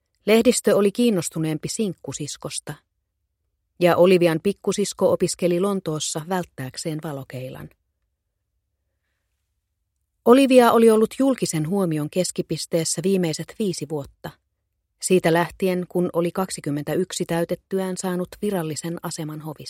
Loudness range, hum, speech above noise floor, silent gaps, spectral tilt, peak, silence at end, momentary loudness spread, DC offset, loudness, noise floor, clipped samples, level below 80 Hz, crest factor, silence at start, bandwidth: 10 LU; none; 55 dB; none; -5 dB/octave; 0 dBFS; 0 s; 15 LU; under 0.1%; -21 LUFS; -76 dBFS; under 0.1%; -60 dBFS; 22 dB; 0.25 s; 16.5 kHz